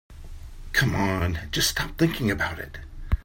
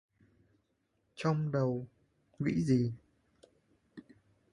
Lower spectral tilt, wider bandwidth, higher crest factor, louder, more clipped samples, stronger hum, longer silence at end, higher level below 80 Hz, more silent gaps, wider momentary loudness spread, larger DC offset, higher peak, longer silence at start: second, -4 dB/octave vs -8 dB/octave; first, 16.5 kHz vs 11 kHz; about the same, 18 dB vs 20 dB; first, -25 LUFS vs -33 LUFS; neither; neither; second, 0.05 s vs 0.55 s; first, -36 dBFS vs -66 dBFS; neither; second, 20 LU vs 25 LU; neither; first, -8 dBFS vs -18 dBFS; second, 0.1 s vs 1.15 s